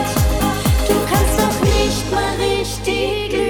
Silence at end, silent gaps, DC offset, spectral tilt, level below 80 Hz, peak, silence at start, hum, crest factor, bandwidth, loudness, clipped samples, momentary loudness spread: 0 s; none; under 0.1%; -4.5 dB/octave; -24 dBFS; -2 dBFS; 0 s; none; 14 dB; over 20 kHz; -17 LUFS; under 0.1%; 4 LU